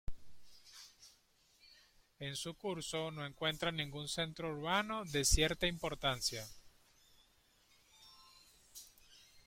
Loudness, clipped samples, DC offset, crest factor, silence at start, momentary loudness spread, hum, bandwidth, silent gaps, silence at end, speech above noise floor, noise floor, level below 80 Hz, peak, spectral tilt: -38 LUFS; under 0.1%; under 0.1%; 26 dB; 0.1 s; 24 LU; none; 16.5 kHz; none; 0.05 s; 33 dB; -71 dBFS; -50 dBFS; -16 dBFS; -3 dB/octave